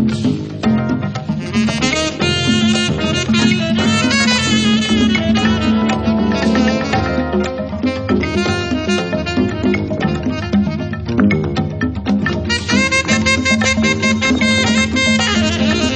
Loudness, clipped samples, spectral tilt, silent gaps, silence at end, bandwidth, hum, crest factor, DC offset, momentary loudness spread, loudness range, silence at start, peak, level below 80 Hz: -15 LUFS; under 0.1%; -4.5 dB/octave; none; 0 s; 9.4 kHz; none; 14 dB; under 0.1%; 6 LU; 4 LU; 0 s; 0 dBFS; -34 dBFS